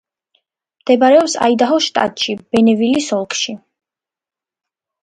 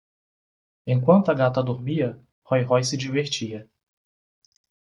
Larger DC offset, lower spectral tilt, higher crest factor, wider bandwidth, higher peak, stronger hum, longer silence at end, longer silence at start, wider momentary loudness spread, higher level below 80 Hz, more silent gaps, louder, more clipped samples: neither; second, -3.5 dB/octave vs -6 dB/octave; about the same, 16 dB vs 20 dB; about the same, 10.5 kHz vs 11.5 kHz; first, 0 dBFS vs -4 dBFS; neither; about the same, 1.45 s vs 1.35 s; about the same, 0.85 s vs 0.85 s; about the same, 10 LU vs 12 LU; about the same, -60 dBFS vs -64 dBFS; second, none vs 2.32-2.42 s; first, -14 LUFS vs -23 LUFS; neither